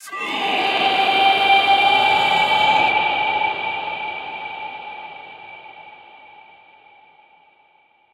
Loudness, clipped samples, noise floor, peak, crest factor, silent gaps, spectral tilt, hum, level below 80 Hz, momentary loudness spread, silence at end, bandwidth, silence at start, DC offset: -17 LUFS; under 0.1%; -57 dBFS; -4 dBFS; 16 dB; none; -2.5 dB/octave; none; -64 dBFS; 21 LU; 2.2 s; 14.5 kHz; 0 s; under 0.1%